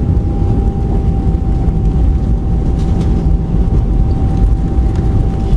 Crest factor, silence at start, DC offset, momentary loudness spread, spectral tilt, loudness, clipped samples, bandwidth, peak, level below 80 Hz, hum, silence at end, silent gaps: 10 dB; 0 s; under 0.1%; 1 LU; -10 dB/octave; -15 LUFS; under 0.1%; 5.4 kHz; -2 dBFS; -14 dBFS; none; 0 s; none